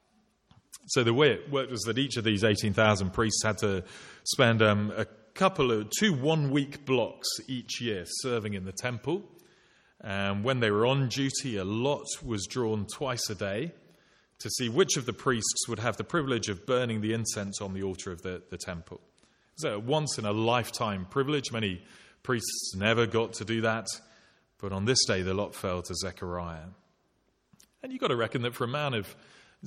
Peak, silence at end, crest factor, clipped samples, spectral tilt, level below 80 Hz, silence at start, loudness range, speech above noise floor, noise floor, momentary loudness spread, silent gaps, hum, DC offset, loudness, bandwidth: -8 dBFS; 0 s; 22 dB; under 0.1%; -4 dB/octave; -60 dBFS; 0.75 s; 7 LU; 43 dB; -72 dBFS; 12 LU; none; none; under 0.1%; -29 LUFS; 16 kHz